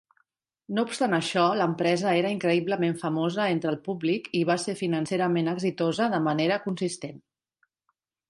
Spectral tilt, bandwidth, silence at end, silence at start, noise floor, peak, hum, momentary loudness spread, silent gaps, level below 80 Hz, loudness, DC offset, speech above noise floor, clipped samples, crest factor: -5.5 dB/octave; 11.5 kHz; 1.1 s; 0.7 s; -78 dBFS; -10 dBFS; none; 6 LU; none; -72 dBFS; -26 LUFS; under 0.1%; 52 dB; under 0.1%; 18 dB